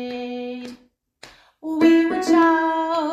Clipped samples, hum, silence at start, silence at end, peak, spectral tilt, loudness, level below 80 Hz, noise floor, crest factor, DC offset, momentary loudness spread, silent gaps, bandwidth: under 0.1%; none; 0 s; 0 s; -4 dBFS; -4 dB/octave; -19 LUFS; -62 dBFS; -52 dBFS; 16 dB; under 0.1%; 19 LU; none; 8.6 kHz